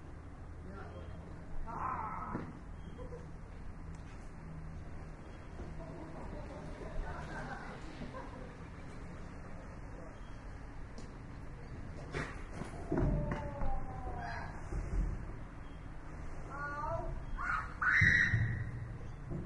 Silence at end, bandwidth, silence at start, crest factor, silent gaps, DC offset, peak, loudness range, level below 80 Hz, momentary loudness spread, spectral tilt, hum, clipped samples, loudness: 0 s; 11 kHz; 0 s; 24 dB; none; under 0.1%; -16 dBFS; 16 LU; -46 dBFS; 15 LU; -6.5 dB/octave; none; under 0.1%; -40 LUFS